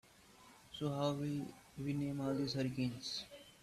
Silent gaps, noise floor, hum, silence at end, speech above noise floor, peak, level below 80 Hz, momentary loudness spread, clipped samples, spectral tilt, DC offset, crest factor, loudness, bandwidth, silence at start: none; -63 dBFS; none; 0.1 s; 24 dB; -24 dBFS; -70 dBFS; 15 LU; under 0.1%; -6 dB/octave; under 0.1%; 18 dB; -41 LUFS; 14 kHz; 0.3 s